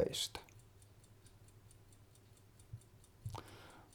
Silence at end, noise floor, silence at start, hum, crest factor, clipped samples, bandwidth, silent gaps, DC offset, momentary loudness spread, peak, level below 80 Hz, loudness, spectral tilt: 0 s; -64 dBFS; 0 s; none; 26 dB; under 0.1%; 19.5 kHz; none; under 0.1%; 22 LU; -22 dBFS; -66 dBFS; -46 LUFS; -3.5 dB/octave